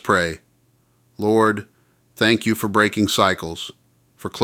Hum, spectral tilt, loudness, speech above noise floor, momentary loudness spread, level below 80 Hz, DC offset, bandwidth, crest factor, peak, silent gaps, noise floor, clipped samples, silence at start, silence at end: none; -4.5 dB/octave; -19 LUFS; 42 dB; 16 LU; -54 dBFS; under 0.1%; 17 kHz; 20 dB; -2 dBFS; none; -61 dBFS; under 0.1%; 0.05 s; 0 s